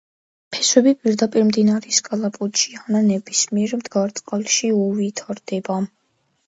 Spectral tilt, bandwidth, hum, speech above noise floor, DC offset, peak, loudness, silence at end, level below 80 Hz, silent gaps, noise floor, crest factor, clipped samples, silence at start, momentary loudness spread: -3.5 dB/octave; 8 kHz; none; 48 dB; under 0.1%; 0 dBFS; -19 LUFS; 0.6 s; -68 dBFS; none; -67 dBFS; 20 dB; under 0.1%; 0.5 s; 10 LU